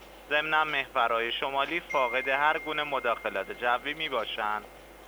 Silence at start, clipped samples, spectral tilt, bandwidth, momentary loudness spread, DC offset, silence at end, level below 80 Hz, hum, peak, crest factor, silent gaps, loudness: 0 s; under 0.1%; -3.5 dB/octave; over 20 kHz; 6 LU; under 0.1%; 0 s; -58 dBFS; 50 Hz at -60 dBFS; -12 dBFS; 18 dB; none; -28 LUFS